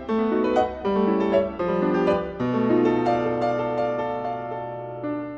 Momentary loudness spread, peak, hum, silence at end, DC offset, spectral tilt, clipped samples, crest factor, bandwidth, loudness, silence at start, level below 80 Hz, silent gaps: 10 LU; -8 dBFS; none; 0 s; under 0.1%; -8 dB/octave; under 0.1%; 14 dB; 7.6 kHz; -24 LUFS; 0 s; -50 dBFS; none